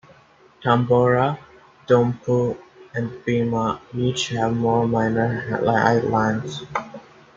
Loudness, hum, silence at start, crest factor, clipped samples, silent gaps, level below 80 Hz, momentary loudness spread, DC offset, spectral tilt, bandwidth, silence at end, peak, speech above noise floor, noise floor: -21 LUFS; none; 0.6 s; 18 dB; under 0.1%; none; -54 dBFS; 11 LU; under 0.1%; -6.5 dB/octave; 7.8 kHz; 0.35 s; -2 dBFS; 32 dB; -52 dBFS